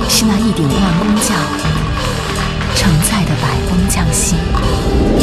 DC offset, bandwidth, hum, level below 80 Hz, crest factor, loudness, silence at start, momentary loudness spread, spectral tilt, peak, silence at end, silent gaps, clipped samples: under 0.1%; 13.5 kHz; none; -20 dBFS; 14 dB; -14 LUFS; 0 s; 5 LU; -4.5 dB/octave; 0 dBFS; 0 s; none; under 0.1%